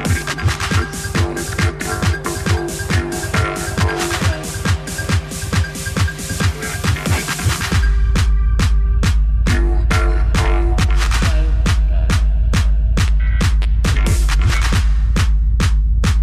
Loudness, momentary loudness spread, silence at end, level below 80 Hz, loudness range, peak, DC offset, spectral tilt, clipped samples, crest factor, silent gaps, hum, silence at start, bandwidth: -18 LUFS; 3 LU; 0 s; -16 dBFS; 3 LU; -4 dBFS; under 0.1%; -5 dB/octave; under 0.1%; 10 dB; none; none; 0 s; 14 kHz